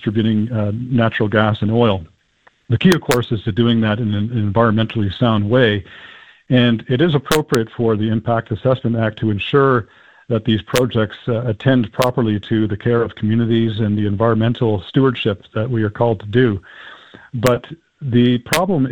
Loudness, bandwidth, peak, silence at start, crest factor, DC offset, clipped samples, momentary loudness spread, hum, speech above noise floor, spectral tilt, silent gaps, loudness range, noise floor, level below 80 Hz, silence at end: -17 LUFS; 17 kHz; 0 dBFS; 0 s; 16 dB; 0.4%; under 0.1%; 6 LU; none; 39 dB; -6.5 dB/octave; none; 2 LU; -55 dBFS; -48 dBFS; 0 s